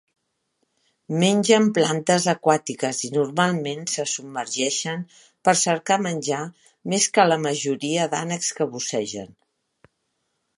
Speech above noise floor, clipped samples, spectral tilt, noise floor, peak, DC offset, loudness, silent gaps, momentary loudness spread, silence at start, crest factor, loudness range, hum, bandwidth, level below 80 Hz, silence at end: 52 dB; under 0.1%; -3.5 dB/octave; -74 dBFS; -2 dBFS; under 0.1%; -22 LUFS; none; 11 LU; 1.1 s; 22 dB; 3 LU; none; 11.5 kHz; -72 dBFS; 1.25 s